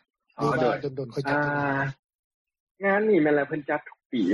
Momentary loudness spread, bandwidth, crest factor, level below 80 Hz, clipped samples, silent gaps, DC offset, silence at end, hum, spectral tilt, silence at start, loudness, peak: 10 LU; 11.5 kHz; 16 dB; -64 dBFS; under 0.1%; 1.99-2.09 s, 2.15-2.45 s, 2.60-2.75 s, 4.06-4.10 s; under 0.1%; 0 s; none; -7.5 dB/octave; 0.4 s; -26 LUFS; -10 dBFS